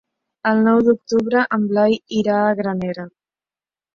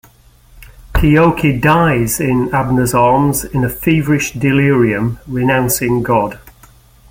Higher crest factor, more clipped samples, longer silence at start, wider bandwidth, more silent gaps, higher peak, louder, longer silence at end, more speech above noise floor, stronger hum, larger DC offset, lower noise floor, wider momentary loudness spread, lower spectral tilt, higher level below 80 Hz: about the same, 16 dB vs 14 dB; neither; about the same, 0.45 s vs 0.55 s; second, 7 kHz vs 17 kHz; neither; second, -4 dBFS vs 0 dBFS; second, -18 LUFS vs -13 LUFS; first, 0.85 s vs 0.6 s; first, over 73 dB vs 33 dB; neither; neither; first, under -90 dBFS vs -46 dBFS; first, 10 LU vs 6 LU; about the same, -6.5 dB/octave vs -6 dB/octave; second, -58 dBFS vs -30 dBFS